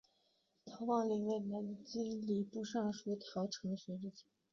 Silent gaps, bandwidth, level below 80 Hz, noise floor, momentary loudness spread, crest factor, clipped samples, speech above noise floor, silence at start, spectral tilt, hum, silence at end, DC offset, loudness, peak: none; 7.4 kHz; -80 dBFS; -79 dBFS; 10 LU; 16 dB; under 0.1%; 39 dB; 0.65 s; -6.5 dB/octave; none; 0.3 s; under 0.1%; -41 LUFS; -24 dBFS